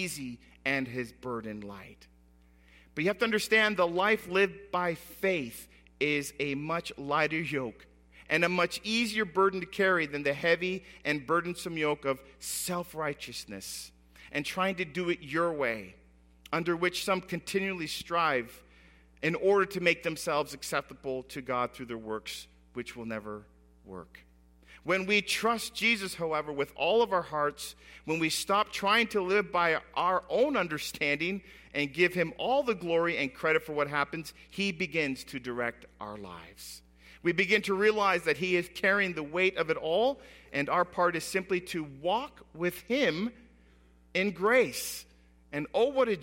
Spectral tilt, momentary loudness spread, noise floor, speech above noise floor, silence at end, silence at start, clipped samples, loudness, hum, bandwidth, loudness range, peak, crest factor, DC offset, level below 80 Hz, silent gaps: -4 dB/octave; 15 LU; -61 dBFS; 30 dB; 0 s; 0 s; under 0.1%; -30 LUFS; none; 16.5 kHz; 6 LU; -10 dBFS; 22 dB; under 0.1%; -62 dBFS; none